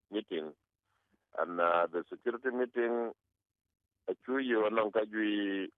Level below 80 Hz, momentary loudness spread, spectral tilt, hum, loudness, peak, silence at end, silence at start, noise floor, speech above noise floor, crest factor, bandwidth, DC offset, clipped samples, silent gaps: -86 dBFS; 12 LU; -2.5 dB/octave; none; -34 LUFS; -14 dBFS; 0.1 s; 0.1 s; -80 dBFS; 47 dB; 20 dB; 4.1 kHz; under 0.1%; under 0.1%; none